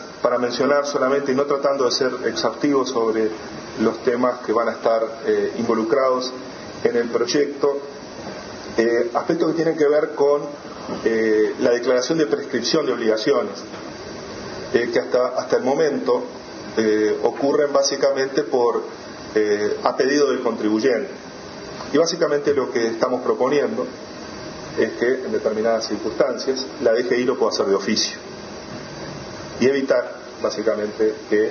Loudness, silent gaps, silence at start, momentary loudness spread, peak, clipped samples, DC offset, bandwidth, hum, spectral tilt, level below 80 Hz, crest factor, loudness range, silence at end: -20 LUFS; none; 0 s; 14 LU; 0 dBFS; under 0.1%; under 0.1%; 6.8 kHz; none; -4 dB/octave; -58 dBFS; 20 dB; 3 LU; 0 s